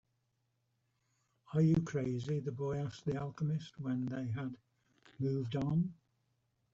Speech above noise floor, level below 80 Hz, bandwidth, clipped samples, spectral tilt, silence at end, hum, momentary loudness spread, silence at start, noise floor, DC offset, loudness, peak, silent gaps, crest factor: 45 dB; -66 dBFS; 7.6 kHz; under 0.1%; -8.5 dB/octave; 0.8 s; none; 9 LU; 1.5 s; -81 dBFS; under 0.1%; -37 LUFS; -20 dBFS; none; 18 dB